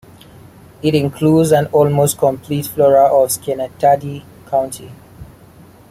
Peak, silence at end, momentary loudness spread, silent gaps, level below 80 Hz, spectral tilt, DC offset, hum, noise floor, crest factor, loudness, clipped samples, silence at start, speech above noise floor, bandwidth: 0 dBFS; 0.65 s; 11 LU; none; -50 dBFS; -6 dB/octave; under 0.1%; none; -42 dBFS; 16 dB; -15 LUFS; under 0.1%; 0.85 s; 28 dB; 16.5 kHz